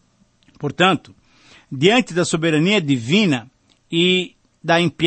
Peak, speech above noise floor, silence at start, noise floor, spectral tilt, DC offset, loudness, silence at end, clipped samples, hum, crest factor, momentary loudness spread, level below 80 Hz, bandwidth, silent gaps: -2 dBFS; 40 dB; 0.6 s; -57 dBFS; -5 dB/octave; under 0.1%; -18 LUFS; 0 s; under 0.1%; none; 18 dB; 13 LU; -58 dBFS; 8.8 kHz; none